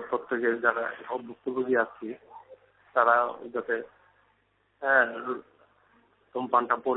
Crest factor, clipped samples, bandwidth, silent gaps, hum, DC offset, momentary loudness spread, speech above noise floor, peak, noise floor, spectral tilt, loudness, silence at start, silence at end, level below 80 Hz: 22 dB; under 0.1%; 4.1 kHz; none; 50 Hz at -75 dBFS; under 0.1%; 15 LU; 42 dB; -8 dBFS; -70 dBFS; -8.5 dB/octave; -28 LUFS; 0 s; 0 s; -74 dBFS